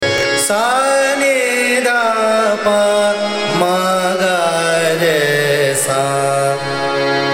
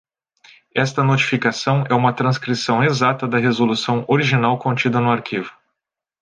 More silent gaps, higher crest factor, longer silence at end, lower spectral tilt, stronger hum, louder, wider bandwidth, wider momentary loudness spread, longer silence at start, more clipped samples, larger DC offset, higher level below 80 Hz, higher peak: neither; about the same, 12 dB vs 16 dB; second, 0 s vs 0.7 s; second, -3 dB/octave vs -6 dB/octave; neither; first, -14 LUFS vs -18 LUFS; first, 16.5 kHz vs 9.4 kHz; about the same, 3 LU vs 5 LU; second, 0 s vs 0.75 s; neither; neither; first, -56 dBFS vs -62 dBFS; about the same, -2 dBFS vs -2 dBFS